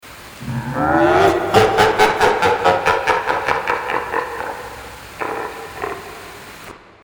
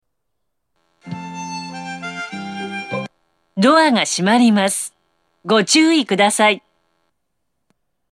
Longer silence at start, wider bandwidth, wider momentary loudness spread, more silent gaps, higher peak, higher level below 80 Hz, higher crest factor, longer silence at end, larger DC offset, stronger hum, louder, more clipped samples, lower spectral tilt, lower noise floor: second, 0.05 s vs 1.05 s; first, over 20 kHz vs 14 kHz; first, 21 LU vs 17 LU; neither; about the same, 0 dBFS vs -2 dBFS; first, -44 dBFS vs -68 dBFS; about the same, 18 dB vs 18 dB; second, 0.25 s vs 1.55 s; neither; neither; about the same, -17 LUFS vs -16 LUFS; neither; about the same, -4.5 dB/octave vs -3.5 dB/octave; second, -38 dBFS vs -77 dBFS